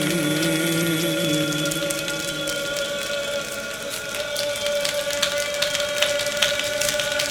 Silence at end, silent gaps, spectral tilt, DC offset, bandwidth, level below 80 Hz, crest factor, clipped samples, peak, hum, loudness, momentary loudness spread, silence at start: 0 s; none; -2.5 dB/octave; under 0.1%; over 20 kHz; -54 dBFS; 24 dB; under 0.1%; 0 dBFS; none; -23 LUFS; 6 LU; 0 s